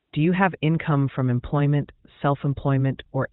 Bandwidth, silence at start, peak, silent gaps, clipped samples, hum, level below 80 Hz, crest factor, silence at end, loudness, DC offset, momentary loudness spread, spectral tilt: 4.1 kHz; 0.15 s; -4 dBFS; none; under 0.1%; none; -48 dBFS; 18 dB; 0.05 s; -23 LUFS; under 0.1%; 5 LU; -12 dB/octave